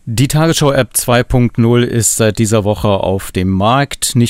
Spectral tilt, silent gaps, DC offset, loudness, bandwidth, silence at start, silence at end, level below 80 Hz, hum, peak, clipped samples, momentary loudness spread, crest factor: -5 dB/octave; none; under 0.1%; -12 LUFS; 16.5 kHz; 0.05 s; 0 s; -32 dBFS; none; 0 dBFS; under 0.1%; 3 LU; 12 dB